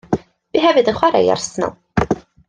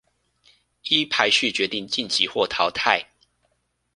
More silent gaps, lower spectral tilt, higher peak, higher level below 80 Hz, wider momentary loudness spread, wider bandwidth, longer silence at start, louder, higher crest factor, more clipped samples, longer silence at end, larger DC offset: neither; first, -5 dB/octave vs -2 dB/octave; about the same, 0 dBFS vs -2 dBFS; first, -42 dBFS vs -62 dBFS; first, 10 LU vs 6 LU; second, 10 kHz vs 11.5 kHz; second, 0.1 s vs 0.85 s; first, -17 LUFS vs -21 LUFS; second, 16 dB vs 24 dB; neither; second, 0.3 s vs 0.9 s; neither